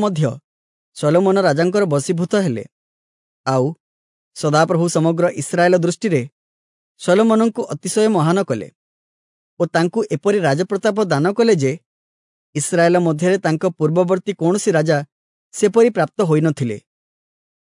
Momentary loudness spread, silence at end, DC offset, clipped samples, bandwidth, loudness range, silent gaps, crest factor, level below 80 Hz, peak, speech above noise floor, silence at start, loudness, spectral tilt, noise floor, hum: 9 LU; 0.95 s; under 0.1%; under 0.1%; 11 kHz; 2 LU; 0.44-0.92 s, 2.72-3.44 s, 3.80-4.31 s, 6.32-6.95 s, 8.75-9.57 s, 11.86-12.53 s, 15.12-15.50 s; 16 dB; -68 dBFS; -2 dBFS; over 74 dB; 0 s; -17 LUFS; -6 dB/octave; under -90 dBFS; none